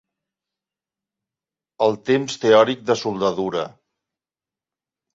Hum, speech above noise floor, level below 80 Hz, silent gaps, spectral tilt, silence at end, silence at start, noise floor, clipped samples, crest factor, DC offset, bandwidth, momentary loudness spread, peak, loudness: none; over 71 dB; -64 dBFS; none; -5 dB/octave; 1.45 s; 1.8 s; under -90 dBFS; under 0.1%; 20 dB; under 0.1%; 8 kHz; 10 LU; -2 dBFS; -20 LUFS